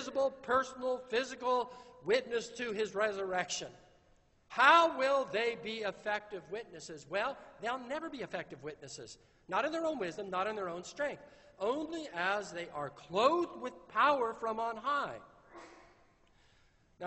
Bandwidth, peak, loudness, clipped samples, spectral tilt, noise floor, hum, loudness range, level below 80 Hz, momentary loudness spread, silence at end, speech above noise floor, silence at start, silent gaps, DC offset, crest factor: 8.2 kHz; -10 dBFS; -34 LUFS; under 0.1%; -3 dB/octave; -68 dBFS; none; 8 LU; -72 dBFS; 16 LU; 0 s; 33 dB; 0 s; none; under 0.1%; 26 dB